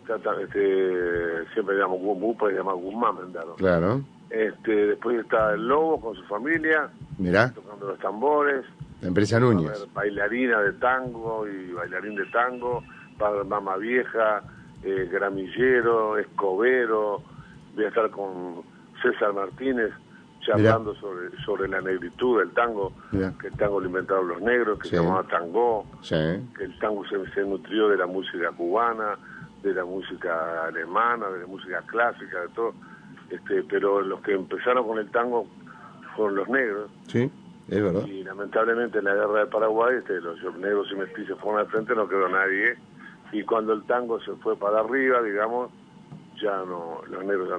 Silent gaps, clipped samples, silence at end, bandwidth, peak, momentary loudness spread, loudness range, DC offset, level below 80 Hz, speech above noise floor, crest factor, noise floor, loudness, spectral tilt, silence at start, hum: none; under 0.1%; 0 s; 9.8 kHz; -4 dBFS; 11 LU; 3 LU; under 0.1%; -56 dBFS; 21 dB; 22 dB; -46 dBFS; -25 LUFS; -7 dB/octave; 0.05 s; none